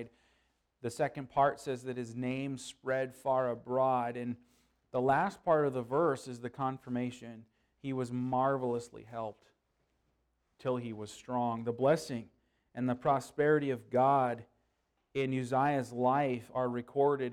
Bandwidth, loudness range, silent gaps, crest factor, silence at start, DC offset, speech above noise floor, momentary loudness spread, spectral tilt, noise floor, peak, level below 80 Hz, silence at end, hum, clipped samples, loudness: 14.5 kHz; 6 LU; none; 18 dB; 0 s; under 0.1%; 46 dB; 13 LU; -6.5 dB/octave; -79 dBFS; -16 dBFS; -70 dBFS; 0 s; none; under 0.1%; -33 LUFS